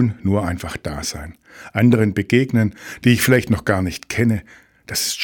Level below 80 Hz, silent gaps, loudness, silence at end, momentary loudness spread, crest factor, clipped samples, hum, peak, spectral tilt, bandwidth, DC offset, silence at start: -42 dBFS; none; -19 LUFS; 0 s; 12 LU; 16 dB; under 0.1%; none; -2 dBFS; -5.5 dB/octave; 19 kHz; under 0.1%; 0 s